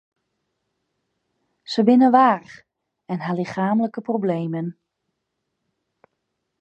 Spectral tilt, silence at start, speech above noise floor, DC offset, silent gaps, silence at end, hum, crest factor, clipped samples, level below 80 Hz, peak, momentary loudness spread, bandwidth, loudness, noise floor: -7.5 dB/octave; 1.7 s; 59 dB; under 0.1%; none; 1.9 s; none; 20 dB; under 0.1%; -74 dBFS; -2 dBFS; 15 LU; 8 kHz; -20 LUFS; -78 dBFS